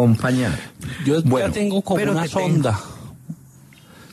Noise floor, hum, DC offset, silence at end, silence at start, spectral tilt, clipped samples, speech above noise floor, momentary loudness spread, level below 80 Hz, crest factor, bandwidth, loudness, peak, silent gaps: -46 dBFS; none; under 0.1%; 0.1 s; 0 s; -6.5 dB/octave; under 0.1%; 28 dB; 20 LU; -50 dBFS; 14 dB; 13.5 kHz; -20 LUFS; -6 dBFS; none